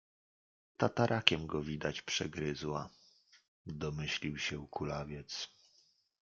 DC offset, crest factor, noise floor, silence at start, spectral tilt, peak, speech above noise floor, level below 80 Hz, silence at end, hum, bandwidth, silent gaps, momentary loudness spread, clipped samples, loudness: under 0.1%; 32 dB; -71 dBFS; 0.8 s; -4.5 dB/octave; -6 dBFS; 35 dB; -62 dBFS; 0.75 s; none; 7.6 kHz; 3.48-3.65 s; 12 LU; under 0.1%; -36 LUFS